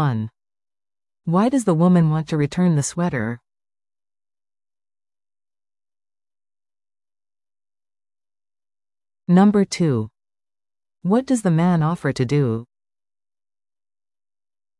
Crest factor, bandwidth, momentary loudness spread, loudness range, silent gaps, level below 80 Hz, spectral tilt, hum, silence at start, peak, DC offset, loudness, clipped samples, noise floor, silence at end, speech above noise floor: 18 dB; 12 kHz; 14 LU; 6 LU; none; -58 dBFS; -7 dB/octave; none; 0 s; -6 dBFS; under 0.1%; -19 LUFS; under 0.1%; under -90 dBFS; 2.15 s; over 72 dB